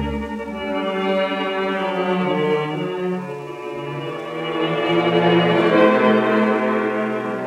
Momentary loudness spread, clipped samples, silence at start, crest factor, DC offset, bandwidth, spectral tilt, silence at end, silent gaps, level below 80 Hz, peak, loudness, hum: 13 LU; under 0.1%; 0 s; 18 dB; under 0.1%; 12 kHz; -7 dB/octave; 0 s; none; -46 dBFS; -2 dBFS; -20 LUFS; none